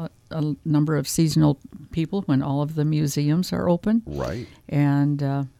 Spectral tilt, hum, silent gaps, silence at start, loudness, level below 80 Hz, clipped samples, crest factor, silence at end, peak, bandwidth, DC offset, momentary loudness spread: -6.5 dB/octave; none; none; 0 s; -23 LUFS; -48 dBFS; under 0.1%; 16 dB; 0.1 s; -6 dBFS; 15.5 kHz; under 0.1%; 9 LU